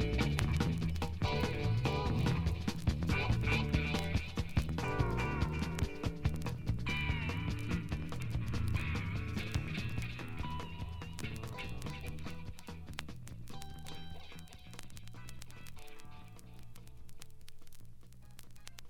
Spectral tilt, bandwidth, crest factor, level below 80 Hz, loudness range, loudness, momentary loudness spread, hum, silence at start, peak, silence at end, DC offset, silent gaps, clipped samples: -6 dB/octave; 17 kHz; 24 dB; -44 dBFS; 19 LU; -37 LUFS; 21 LU; none; 0 s; -12 dBFS; 0 s; under 0.1%; none; under 0.1%